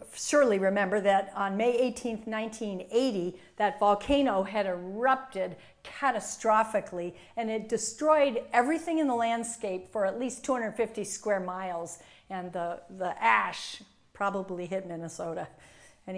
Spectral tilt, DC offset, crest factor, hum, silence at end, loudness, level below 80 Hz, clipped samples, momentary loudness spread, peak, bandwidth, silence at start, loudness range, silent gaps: -4 dB/octave; under 0.1%; 20 dB; none; 0 s; -29 LUFS; -60 dBFS; under 0.1%; 13 LU; -8 dBFS; 10.5 kHz; 0 s; 4 LU; none